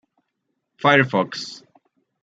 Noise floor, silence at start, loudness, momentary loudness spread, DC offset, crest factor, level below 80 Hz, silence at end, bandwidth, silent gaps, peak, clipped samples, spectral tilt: -76 dBFS; 0.85 s; -19 LUFS; 16 LU; under 0.1%; 22 dB; -70 dBFS; 0.65 s; 9 kHz; none; -2 dBFS; under 0.1%; -5.5 dB/octave